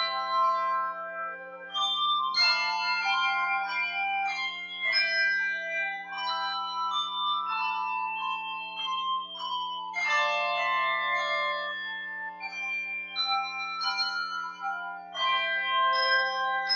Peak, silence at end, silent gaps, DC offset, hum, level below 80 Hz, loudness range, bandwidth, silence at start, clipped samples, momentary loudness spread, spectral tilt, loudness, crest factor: -14 dBFS; 0 s; none; under 0.1%; 60 Hz at -65 dBFS; -86 dBFS; 4 LU; 7.4 kHz; 0 s; under 0.1%; 10 LU; 0 dB/octave; -28 LUFS; 16 dB